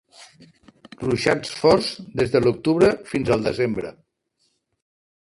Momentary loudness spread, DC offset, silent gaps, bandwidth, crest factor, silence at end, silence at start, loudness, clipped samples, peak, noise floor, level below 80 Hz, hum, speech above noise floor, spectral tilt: 9 LU; under 0.1%; none; 11.5 kHz; 20 dB; 1.4 s; 0.2 s; -21 LUFS; under 0.1%; -4 dBFS; -70 dBFS; -50 dBFS; none; 50 dB; -6 dB/octave